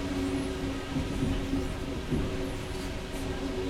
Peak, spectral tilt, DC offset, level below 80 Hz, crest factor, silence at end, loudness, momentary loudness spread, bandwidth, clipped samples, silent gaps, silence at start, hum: -18 dBFS; -6 dB/octave; under 0.1%; -38 dBFS; 14 dB; 0 s; -33 LUFS; 5 LU; 16 kHz; under 0.1%; none; 0 s; none